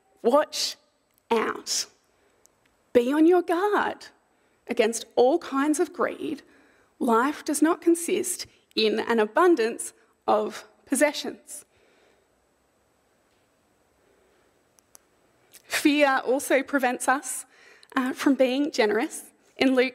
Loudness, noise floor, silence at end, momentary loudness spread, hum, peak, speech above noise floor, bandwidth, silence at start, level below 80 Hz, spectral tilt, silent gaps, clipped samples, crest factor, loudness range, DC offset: -24 LUFS; -67 dBFS; 0.05 s; 14 LU; none; -6 dBFS; 43 dB; 16 kHz; 0.25 s; -72 dBFS; -2.5 dB/octave; none; under 0.1%; 20 dB; 6 LU; under 0.1%